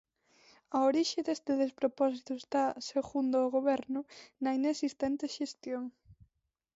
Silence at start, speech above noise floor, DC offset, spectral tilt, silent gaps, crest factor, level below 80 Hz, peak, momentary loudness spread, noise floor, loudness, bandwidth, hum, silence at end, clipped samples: 0.7 s; 49 dB; under 0.1%; -3.5 dB/octave; none; 16 dB; -72 dBFS; -18 dBFS; 10 LU; -81 dBFS; -33 LUFS; 8 kHz; none; 0.6 s; under 0.1%